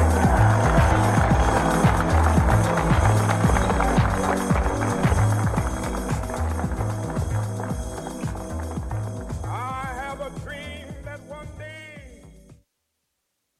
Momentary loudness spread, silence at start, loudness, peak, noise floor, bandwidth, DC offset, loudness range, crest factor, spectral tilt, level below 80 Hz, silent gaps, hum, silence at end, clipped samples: 17 LU; 0 s; -22 LUFS; -6 dBFS; -77 dBFS; 13.5 kHz; under 0.1%; 14 LU; 16 dB; -6.5 dB/octave; -30 dBFS; none; none; 1.05 s; under 0.1%